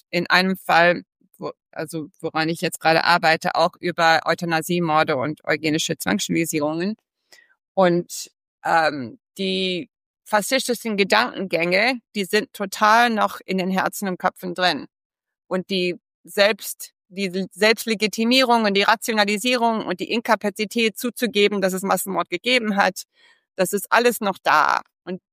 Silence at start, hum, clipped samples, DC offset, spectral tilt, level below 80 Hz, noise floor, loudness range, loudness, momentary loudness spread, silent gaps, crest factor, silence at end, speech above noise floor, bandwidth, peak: 0.15 s; none; under 0.1%; under 0.1%; -3.5 dB/octave; -68 dBFS; -55 dBFS; 4 LU; -20 LUFS; 13 LU; 7.68-7.75 s, 8.48-8.58 s, 10.06-10.14 s, 15.05-15.10 s, 16.14-16.24 s; 20 dB; 0.15 s; 35 dB; 15.5 kHz; -2 dBFS